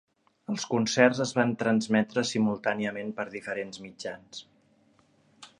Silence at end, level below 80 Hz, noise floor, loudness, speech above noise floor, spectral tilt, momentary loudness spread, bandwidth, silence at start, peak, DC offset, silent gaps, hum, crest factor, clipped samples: 0.15 s; -72 dBFS; -64 dBFS; -28 LUFS; 37 dB; -4.5 dB/octave; 17 LU; 11 kHz; 0.5 s; -6 dBFS; under 0.1%; none; none; 24 dB; under 0.1%